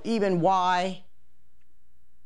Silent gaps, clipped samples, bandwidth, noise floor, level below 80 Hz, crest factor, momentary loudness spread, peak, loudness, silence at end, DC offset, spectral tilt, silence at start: none; under 0.1%; 11.5 kHz; -68 dBFS; -68 dBFS; 16 dB; 12 LU; -12 dBFS; -25 LUFS; 1.3 s; 1%; -6 dB/octave; 0.05 s